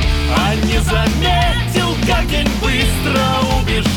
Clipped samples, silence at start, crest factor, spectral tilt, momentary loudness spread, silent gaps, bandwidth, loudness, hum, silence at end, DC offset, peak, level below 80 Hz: under 0.1%; 0 s; 8 dB; -5 dB/octave; 2 LU; none; 19 kHz; -15 LUFS; none; 0 s; under 0.1%; -6 dBFS; -20 dBFS